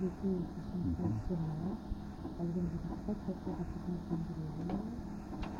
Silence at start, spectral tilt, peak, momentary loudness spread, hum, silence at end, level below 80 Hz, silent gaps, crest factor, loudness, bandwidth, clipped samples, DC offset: 0 s; -9 dB/octave; -24 dBFS; 7 LU; none; 0 s; -48 dBFS; none; 14 dB; -40 LUFS; 10 kHz; under 0.1%; under 0.1%